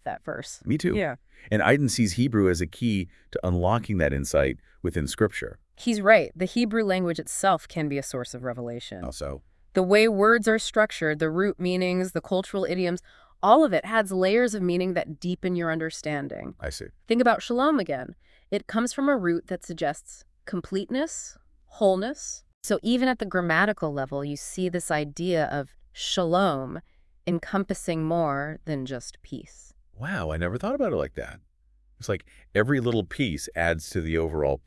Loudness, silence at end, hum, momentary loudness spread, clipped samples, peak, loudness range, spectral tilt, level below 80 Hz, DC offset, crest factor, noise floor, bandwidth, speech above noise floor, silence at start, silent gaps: -26 LUFS; 0.1 s; none; 14 LU; under 0.1%; -4 dBFS; 6 LU; -5 dB/octave; -48 dBFS; under 0.1%; 22 dB; -61 dBFS; 12 kHz; 36 dB; 0.05 s; 22.54-22.61 s